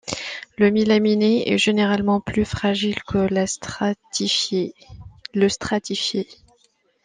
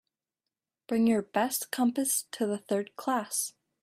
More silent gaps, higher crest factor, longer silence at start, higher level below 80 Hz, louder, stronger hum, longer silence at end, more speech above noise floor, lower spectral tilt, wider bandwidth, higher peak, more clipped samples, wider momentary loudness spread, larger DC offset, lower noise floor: neither; about the same, 16 dB vs 16 dB; second, 0.05 s vs 0.9 s; first, -50 dBFS vs -76 dBFS; first, -21 LUFS vs -30 LUFS; neither; first, 0.7 s vs 0.35 s; second, 42 dB vs 60 dB; about the same, -4.5 dB/octave vs -3.5 dB/octave; second, 9.8 kHz vs 16 kHz; first, -4 dBFS vs -14 dBFS; neither; first, 11 LU vs 6 LU; neither; second, -63 dBFS vs -90 dBFS